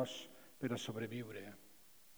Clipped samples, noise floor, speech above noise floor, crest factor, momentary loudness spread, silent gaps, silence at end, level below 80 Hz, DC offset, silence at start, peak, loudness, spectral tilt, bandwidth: under 0.1%; -66 dBFS; 22 dB; 18 dB; 19 LU; none; 0 s; -82 dBFS; under 0.1%; 0 s; -26 dBFS; -45 LUFS; -5 dB/octave; over 20 kHz